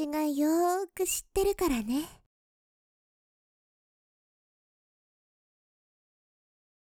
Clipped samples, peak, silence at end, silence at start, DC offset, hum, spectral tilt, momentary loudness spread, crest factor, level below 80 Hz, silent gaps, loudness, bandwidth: under 0.1%; -16 dBFS; 4.75 s; 0 s; under 0.1%; none; -3.5 dB/octave; 7 LU; 18 dB; -54 dBFS; none; -29 LUFS; over 20 kHz